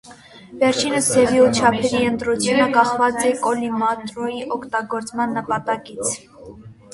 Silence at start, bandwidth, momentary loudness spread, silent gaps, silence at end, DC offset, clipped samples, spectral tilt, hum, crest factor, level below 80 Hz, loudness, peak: 0.05 s; 11.5 kHz; 11 LU; none; 0.2 s; under 0.1%; under 0.1%; -3.5 dB/octave; none; 18 dB; -52 dBFS; -19 LUFS; 0 dBFS